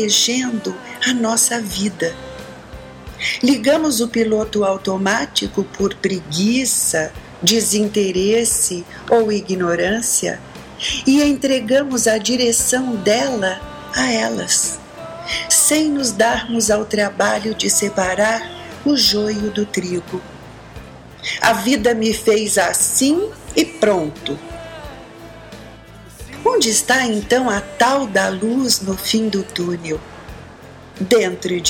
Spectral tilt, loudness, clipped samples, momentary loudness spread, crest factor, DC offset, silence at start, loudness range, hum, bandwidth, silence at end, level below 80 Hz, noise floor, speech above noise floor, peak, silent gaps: -2.5 dB/octave; -17 LUFS; under 0.1%; 19 LU; 16 dB; under 0.1%; 0 s; 3 LU; none; 17 kHz; 0 s; -44 dBFS; -39 dBFS; 22 dB; -2 dBFS; none